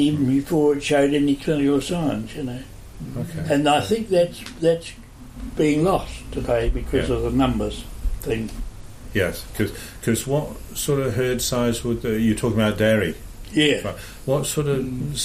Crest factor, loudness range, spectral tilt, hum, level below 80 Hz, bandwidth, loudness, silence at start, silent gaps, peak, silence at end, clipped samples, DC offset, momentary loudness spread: 16 dB; 4 LU; -5.5 dB/octave; none; -36 dBFS; 15.5 kHz; -22 LUFS; 0 s; none; -6 dBFS; 0 s; under 0.1%; under 0.1%; 13 LU